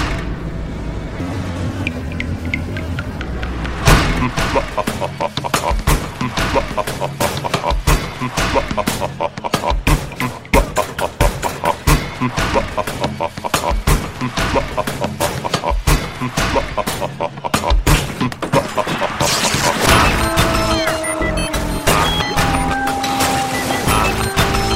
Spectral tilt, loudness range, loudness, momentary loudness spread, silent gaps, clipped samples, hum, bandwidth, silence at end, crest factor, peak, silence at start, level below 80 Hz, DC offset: -4 dB/octave; 4 LU; -18 LUFS; 9 LU; none; under 0.1%; none; 16.5 kHz; 0 s; 18 dB; 0 dBFS; 0 s; -24 dBFS; under 0.1%